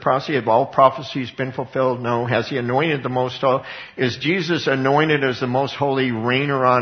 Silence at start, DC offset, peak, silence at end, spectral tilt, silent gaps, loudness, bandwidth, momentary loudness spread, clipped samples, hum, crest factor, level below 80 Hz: 0 s; under 0.1%; 0 dBFS; 0 s; -6.5 dB/octave; none; -20 LUFS; 6.6 kHz; 8 LU; under 0.1%; none; 20 dB; -60 dBFS